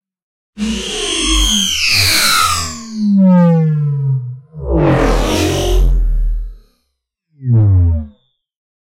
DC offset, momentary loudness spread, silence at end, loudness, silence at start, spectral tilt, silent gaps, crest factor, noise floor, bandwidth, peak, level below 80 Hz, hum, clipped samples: under 0.1%; 14 LU; 0.85 s; -13 LUFS; 0.55 s; -4.5 dB/octave; none; 14 dB; -70 dBFS; 16 kHz; 0 dBFS; -20 dBFS; none; under 0.1%